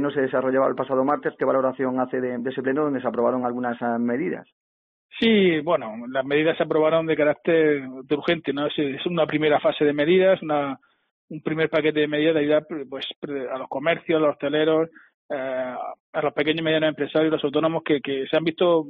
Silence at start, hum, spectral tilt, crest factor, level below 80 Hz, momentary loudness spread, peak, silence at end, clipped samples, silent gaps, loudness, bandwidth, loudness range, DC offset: 0 s; none; -4 dB/octave; 16 dB; -66 dBFS; 10 LU; -8 dBFS; 0 s; under 0.1%; 4.52-5.09 s, 11.11-11.28 s, 13.16-13.22 s, 15.14-15.29 s, 16.00-16.13 s; -23 LUFS; 5 kHz; 3 LU; under 0.1%